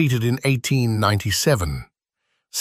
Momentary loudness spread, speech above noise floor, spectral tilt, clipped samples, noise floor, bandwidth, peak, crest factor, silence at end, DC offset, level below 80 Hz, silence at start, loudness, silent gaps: 10 LU; 55 dB; -5 dB/octave; under 0.1%; -75 dBFS; 15.5 kHz; -4 dBFS; 16 dB; 0 s; under 0.1%; -40 dBFS; 0 s; -20 LUFS; none